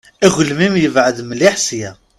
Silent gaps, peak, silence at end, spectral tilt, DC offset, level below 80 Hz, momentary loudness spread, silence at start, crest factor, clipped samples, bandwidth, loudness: none; 0 dBFS; 0.25 s; -4 dB/octave; under 0.1%; -50 dBFS; 6 LU; 0.2 s; 14 dB; under 0.1%; 14 kHz; -14 LUFS